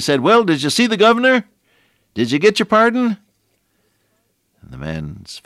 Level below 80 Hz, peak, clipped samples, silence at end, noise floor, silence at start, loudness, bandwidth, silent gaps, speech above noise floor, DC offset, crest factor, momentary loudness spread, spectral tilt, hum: -50 dBFS; -2 dBFS; under 0.1%; 0.05 s; -65 dBFS; 0 s; -15 LUFS; 15 kHz; none; 50 dB; under 0.1%; 14 dB; 17 LU; -4.5 dB/octave; none